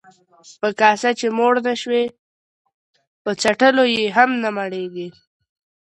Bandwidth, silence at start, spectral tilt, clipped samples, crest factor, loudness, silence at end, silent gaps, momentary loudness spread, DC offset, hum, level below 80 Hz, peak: 11 kHz; 0.45 s; -3.5 dB/octave; under 0.1%; 20 dB; -18 LUFS; 0.85 s; 2.19-2.65 s, 2.74-2.93 s, 3.07-3.25 s; 13 LU; under 0.1%; none; -68 dBFS; 0 dBFS